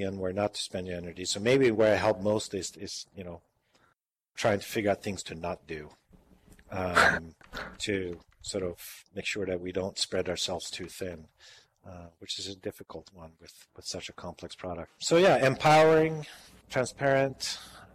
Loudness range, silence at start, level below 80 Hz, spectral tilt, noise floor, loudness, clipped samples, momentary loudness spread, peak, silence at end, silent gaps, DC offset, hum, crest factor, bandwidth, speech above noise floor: 14 LU; 0 s; -60 dBFS; -4 dB/octave; -74 dBFS; -29 LUFS; under 0.1%; 20 LU; -8 dBFS; 0.1 s; none; under 0.1%; none; 22 dB; 15 kHz; 44 dB